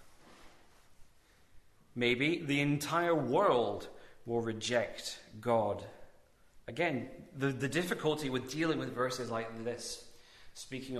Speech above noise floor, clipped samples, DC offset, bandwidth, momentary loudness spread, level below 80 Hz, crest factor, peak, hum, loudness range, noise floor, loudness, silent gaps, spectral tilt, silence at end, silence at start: 30 dB; under 0.1%; under 0.1%; 14 kHz; 16 LU; -66 dBFS; 20 dB; -16 dBFS; none; 4 LU; -63 dBFS; -34 LUFS; none; -5 dB/octave; 0 s; 0 s